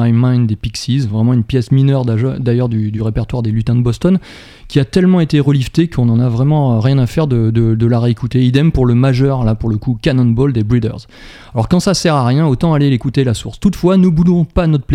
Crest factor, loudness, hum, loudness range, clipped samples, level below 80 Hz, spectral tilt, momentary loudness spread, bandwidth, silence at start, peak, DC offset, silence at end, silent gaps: 12 dB; -13 LUFS; none; 2 LU; under 0.1%; -32 dBFS; -7.5 dB/octave; 6 LU; 11.5 kHz; 0 s; 0 dBFS; under 0.1%; 0 s; none